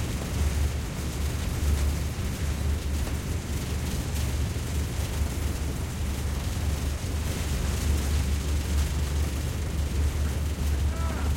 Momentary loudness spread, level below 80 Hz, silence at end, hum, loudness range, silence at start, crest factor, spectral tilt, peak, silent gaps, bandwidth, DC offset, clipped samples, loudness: 4 LU; -30 dBFS; 0 s; none; 2 LU; 0 s; 14 dB; -5 dB/octave; -14 dBFS; none; 17 kHz; under 0.1%; under 0.1%; -29 LUFS